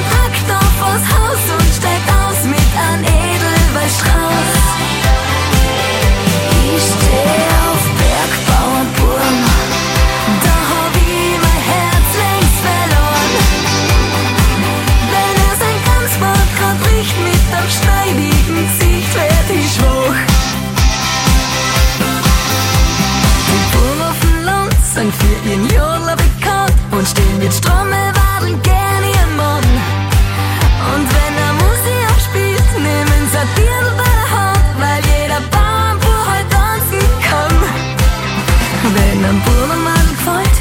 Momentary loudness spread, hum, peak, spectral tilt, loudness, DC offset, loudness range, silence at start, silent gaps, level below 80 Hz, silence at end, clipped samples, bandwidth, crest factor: 2 LU; none; 0 dBFS; -4.5 dB/octave; -12 LUFS; under 0.1%; 1 LU; 0 s; none; -16 dBFS; 0 s; under 0.1%; 17 kHz; 12 dB